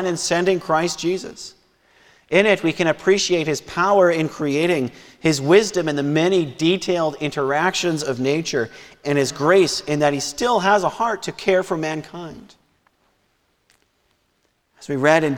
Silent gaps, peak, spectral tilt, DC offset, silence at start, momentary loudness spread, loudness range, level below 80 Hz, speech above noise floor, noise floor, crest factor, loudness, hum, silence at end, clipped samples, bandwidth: none; 0 dBFS; -4.5 dB/octave; under 0.1%; 0 s; 12 LU; 7 LU; -56 dBFS; 47 dB; -67 dBFS; 20 dB; -19 LUFS; none; 0 s; under 0.1%; 16.5 kHz